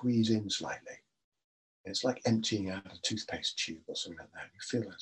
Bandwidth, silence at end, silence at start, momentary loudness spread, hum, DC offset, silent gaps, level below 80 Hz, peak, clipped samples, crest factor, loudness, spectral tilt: 10.5 kHz; 0 s; 0 s; 16 LU; none; under 0.1%; 1.24-1.32 s, 1.44-1.84 s; -74 dBFS; -16 dBFS; under 0.1%; 18 dB; -34 LUFS; -4 dB/octave